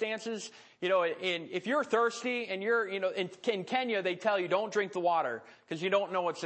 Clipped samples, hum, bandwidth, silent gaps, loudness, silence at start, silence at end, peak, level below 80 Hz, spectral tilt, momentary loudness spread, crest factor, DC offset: under 0.1%; none; 8.8 kHz; none; -32 LUFS; 0 s; 0 s; -16 dBFS; -90 dBFS; -4 dB/octave; 8 LU; 16 dB; under 0.1%